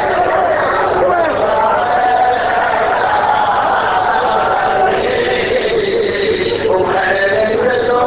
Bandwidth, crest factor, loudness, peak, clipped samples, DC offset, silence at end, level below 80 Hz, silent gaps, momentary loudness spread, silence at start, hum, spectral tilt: 4 kHz; 12 dB; -13 LUFS; -2 dBFS; under 0.1%; under 0.1%; 0 s; -40 dBFS; none; 2 LU; 0 s; none; -8.5 dB/octave